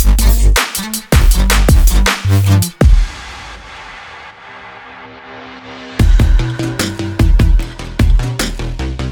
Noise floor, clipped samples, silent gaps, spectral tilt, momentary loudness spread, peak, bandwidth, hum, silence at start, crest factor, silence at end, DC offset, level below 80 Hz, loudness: -33 dBFS; under 0.1%; none; -4.5 dB/octave; 21 LU; 0 dBFS; over 20 kHz; none; 0 s; 12 dB; 0 s; under 0.1%; -14 dBFS; -14 LUFS